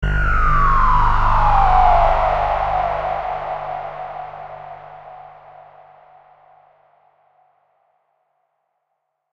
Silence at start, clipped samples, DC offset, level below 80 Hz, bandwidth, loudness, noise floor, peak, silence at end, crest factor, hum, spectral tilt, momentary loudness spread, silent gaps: 0 s; under 0.1%; under 0.1%; -24 dBFS; 6 kHz; -17 LUFS; -74 dBFS; -2 dBFS; 4.05 s; 18 dB; none; -7 dB/octave; 22 LU; none